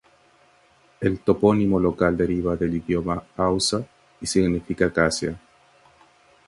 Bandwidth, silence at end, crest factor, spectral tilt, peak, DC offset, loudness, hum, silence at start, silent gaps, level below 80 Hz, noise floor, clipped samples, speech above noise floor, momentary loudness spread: 11.5 kHz; 1.1 s; 20 dB; -5.5 dB/octave; -4 dBFS; under 0.1%; -23 LUFS; none; 1 s; none; -44 dBFS; -58 dBFS; under 0.1%; 36 dB; 10 LU